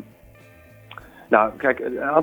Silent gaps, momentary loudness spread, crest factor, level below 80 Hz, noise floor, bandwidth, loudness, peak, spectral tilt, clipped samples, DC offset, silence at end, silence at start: none; 24 LU; 24 dB; -56 dBFS; -49 dBFS; over 20 kHz; -21 LUFS; 0 dBFS; -7 dB/octave; under 0.1%; under 0.1%; 0 s; 0 s